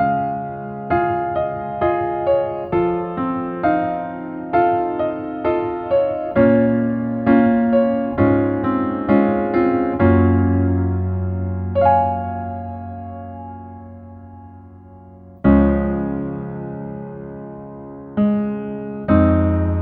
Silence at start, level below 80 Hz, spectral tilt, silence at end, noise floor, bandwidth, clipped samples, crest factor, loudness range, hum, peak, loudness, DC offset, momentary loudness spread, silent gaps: 0 s; -36 dBFS; -12 dB/octave; 0 s; -41 dBFS; 4.6 kHz; under 0.1%; 18 dB; 6 LU; none; -2 dBFS; -19 LUFS; under 0.1%; 17 LU; none